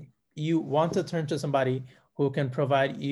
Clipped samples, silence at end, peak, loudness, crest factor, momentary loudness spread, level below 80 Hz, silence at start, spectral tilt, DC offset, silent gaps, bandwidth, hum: under 0.1%; 0 s; -12 dBFS; -28 LUFS; 16 dB; 9 LU; -68 dBFS; 0 s; -7 dB/octave; under 0.1%; none; 12 kHz; none